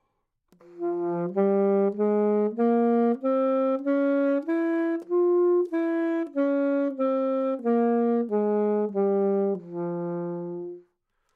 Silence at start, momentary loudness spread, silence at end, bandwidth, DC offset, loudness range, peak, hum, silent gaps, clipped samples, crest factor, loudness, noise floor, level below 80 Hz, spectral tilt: 0.7 s; 9 LU; 0.55 s; 4.4 kHz; under 0.1%; 2 LU; -12 dBFS; none; none; under 0.1%; 14 dB; -25 LUFS; -75 dBFS; -80 dBFS; -10.5 dB/octave